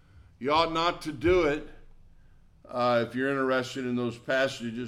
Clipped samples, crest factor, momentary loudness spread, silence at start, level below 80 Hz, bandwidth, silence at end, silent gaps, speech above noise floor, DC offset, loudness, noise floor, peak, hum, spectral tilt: under 0.1%; 18 dB; 7 LU; 0.15 s; -50 dBFS; 13.5 kHz; 0 s; none; 28 dB; under 0.1%; -28 LUFS; -55 dBFS; -12 dBFS; none; -5.5 dB/octave